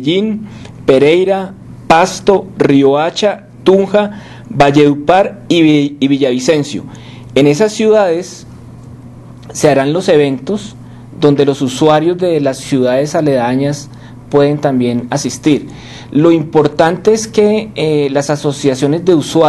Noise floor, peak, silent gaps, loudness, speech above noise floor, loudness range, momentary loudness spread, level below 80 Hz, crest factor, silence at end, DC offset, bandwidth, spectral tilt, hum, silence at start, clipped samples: -32 dBFS; 0 dBFS; none; -12 LUFS; 22 dB; 3 LU; 12 LU; -44 dBFS; 12 dB; 0 s; under 0.1%; 12.5 kHz; -5.5 dB/octave; none; 0 s; 0.3%